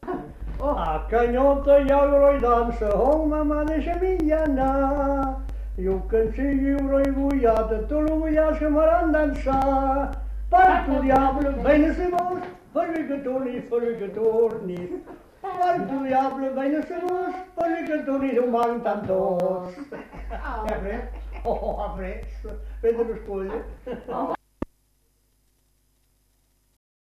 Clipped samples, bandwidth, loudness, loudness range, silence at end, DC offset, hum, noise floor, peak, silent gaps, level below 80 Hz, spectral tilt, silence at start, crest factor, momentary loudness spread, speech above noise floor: under 0.1%; 13.5 kHz; -23 LUFS; 10 LU; 2.5 s; under 0.1%; none; -66 dBFS; -6 dBFS; none; -34 dBFS; -8 dB/octave; 0 s; 16 dB; 15 LU; 43 dB